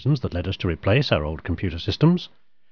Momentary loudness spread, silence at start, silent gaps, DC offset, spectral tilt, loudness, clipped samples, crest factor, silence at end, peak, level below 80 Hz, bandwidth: 8 LU; 0 s; none; 0.4%; -8 dB/octave; -23 LUFS; under 0.1%; 18 dB; 0.45 s; -6 dBFS; -40 dBFS; 5.4 kHz